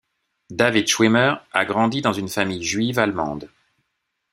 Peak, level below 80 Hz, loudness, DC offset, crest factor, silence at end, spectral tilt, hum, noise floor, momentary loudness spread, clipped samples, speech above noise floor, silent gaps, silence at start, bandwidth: 0 dBFS; -58 dBFS; -20 LUFS; under 0.1%; 20 dB; 0.85 s; -4 dB/octave; none; -76 dBFS; 10 LU; under 0.1%; 56 dB; none; 0.5 s; 15.5 kHz